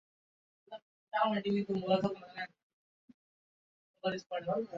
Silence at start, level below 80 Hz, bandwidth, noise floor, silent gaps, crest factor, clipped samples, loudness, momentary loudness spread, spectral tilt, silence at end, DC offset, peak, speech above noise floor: 0.7 s; -74 dBFS; 7.4 kHz; under -90 dBFS; 0.82-1.07 s, 2.63-3.08 s, 3.14-3.94 s; 20 dB; under 0.1%; -35 LUFS; 21 LU; -4.5 dB/octave; 0 s; under 0.1%; -16 dBFS; over 56 dB